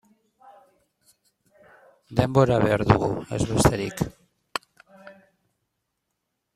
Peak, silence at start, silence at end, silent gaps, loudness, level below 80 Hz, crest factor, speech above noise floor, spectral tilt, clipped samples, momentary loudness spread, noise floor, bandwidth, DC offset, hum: -2 dBFS; 2.1 s; 1.45 s; none; -23 LUFS; -44 dBFS; 24 dB; 58 dB; -6 dB/octave; under 0.1%; 14 LU; -79 dBFS; 15 kHz; under 0.1%; none